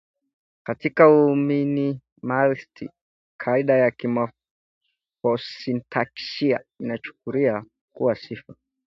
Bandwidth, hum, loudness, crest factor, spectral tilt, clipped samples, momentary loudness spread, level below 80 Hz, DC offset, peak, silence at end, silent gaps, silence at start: 6.2 kHz; none; -23 LUFS; 22 dB; -8 dB/octave; under 0.1%; 15 LU; -68 dBFS; under 0.1%; 0 dBFS; 0.4 s; 2.12-2.16 s, 3.01-3.39 s, 4.51-4.81 s, 7.81-7.88 s; 0.65 s